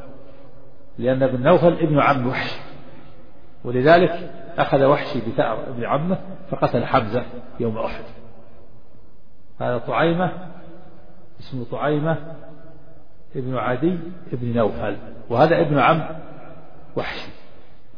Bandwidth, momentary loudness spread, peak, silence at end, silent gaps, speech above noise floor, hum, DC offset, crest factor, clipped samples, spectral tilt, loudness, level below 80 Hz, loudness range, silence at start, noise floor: 5.4 kHz; 20 LU; 0 dBFS; 0.6 s; none; 32 dB; none; 3%; 20 dB; under 0.1%; -9 dB/octave; -21 LUFS; -50 dBFS; 7 LU; 0 s; -52 dBFS